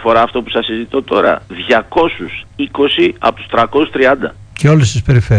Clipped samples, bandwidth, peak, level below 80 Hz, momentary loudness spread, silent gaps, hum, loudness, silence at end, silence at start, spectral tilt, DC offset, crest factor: under 0.1%; 10 kHz; 0 dBFS; -36 dBFS; 8 LU; none; none; -13 LUFS; 0 s; 0 s; -6 dB/octave; under 0.1%; 12 dB